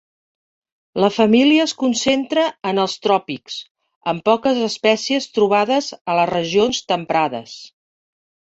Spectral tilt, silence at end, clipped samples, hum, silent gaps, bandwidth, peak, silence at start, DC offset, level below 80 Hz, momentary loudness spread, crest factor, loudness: -4 dB/octave; 0.9 s; under 0.1%; none; 3.71-3.75 s, 3.96-4.01 s, 6.01-6.05 s; 8.2 kHz; -2 dBFS; 0.95 s; under 0.1%; -60 dBFS; 14 LU; 18 dB; -18 LUFS